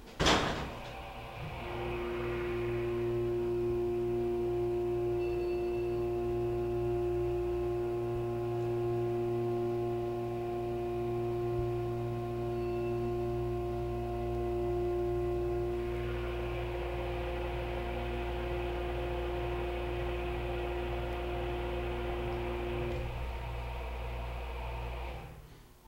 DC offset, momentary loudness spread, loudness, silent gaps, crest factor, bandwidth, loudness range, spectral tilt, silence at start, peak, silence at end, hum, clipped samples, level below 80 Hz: under 0.1%; 7 LU; -35 LUFS; none; 20 dB; 16 kHz; 4 LU; -6.5 dB/octave; 0 s; -14 dBFS; 0 s; none; under 0.1%; -42 dBFS